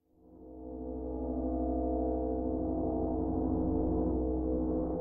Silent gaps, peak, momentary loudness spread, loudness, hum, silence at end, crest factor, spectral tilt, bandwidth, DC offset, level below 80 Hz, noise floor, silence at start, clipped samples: none; -20 dBFS; 9 LU; -34 LUFS; none; 0 s; 12 dB; -11.5 dB/octave; 1.8 kHz; under 0.1%; -40 dBFS; -55 dBFS; 0.25 s; under 0.1%